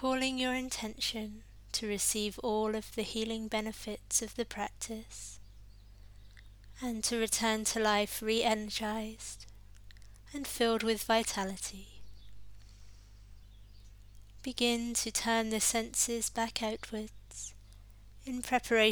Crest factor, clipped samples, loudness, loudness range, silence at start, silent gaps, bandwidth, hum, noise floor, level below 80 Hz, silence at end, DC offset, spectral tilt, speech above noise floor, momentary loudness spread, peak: 24 dB; under 0.1%; -33 LUFS; 6 LU; 0 s; none; over 20 kHz; 50 Hz at -55 dBFS; -54 dBFS; -56 dBFS; 0 s; under 0.1%; -2 dB/octave; 20 dB; 15 LU; -12 dBFS